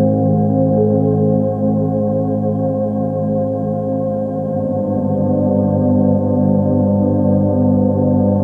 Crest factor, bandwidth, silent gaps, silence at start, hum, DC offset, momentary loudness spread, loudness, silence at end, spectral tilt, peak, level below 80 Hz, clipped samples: 12 dB; 1.7 kHz; none; 0 s; none; under 0.1%; 5 LU; -16 LUFS; 0 s; -13.5 dB/octave; -2 dBFS; -46 dBFS; under 0.1%